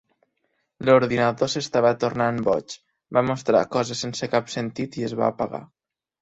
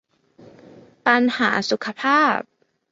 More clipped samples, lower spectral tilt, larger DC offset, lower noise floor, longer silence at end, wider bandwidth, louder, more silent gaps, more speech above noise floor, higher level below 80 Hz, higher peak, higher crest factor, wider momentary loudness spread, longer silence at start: neither; about the same, -5 dB/octave vs -4 dB/octave; neither; first, -73 dBFS vs -50 dBFS; about the same, 0.55 s vs 0.5 s; about the same, 8.2 kHz vs 7.8 kHz; second, -23 LUFS vs -19 LUFS; neither; first, 51 dB vs 31 dB; first, -60 dBFS vs -68 dBFS; about the same, -4 dBFS vs -2 dBFS; about the same, 20 dB vs 20 dB; first, 11 LU vs 7 LU; first, 0.8 s vs 0.45 s